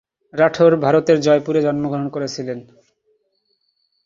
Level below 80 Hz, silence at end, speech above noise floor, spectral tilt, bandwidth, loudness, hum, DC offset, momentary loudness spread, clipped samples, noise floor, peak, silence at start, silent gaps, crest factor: -60 dBFS; 1.45 s; 51 dB; -6.5 dB/octave; 7.6 kHz; -17 LUFS; none; under 0.1%; 15 LU; under 0.1%; -68 dBFS; -2 dBFS; 0.35 s; none; 18 dB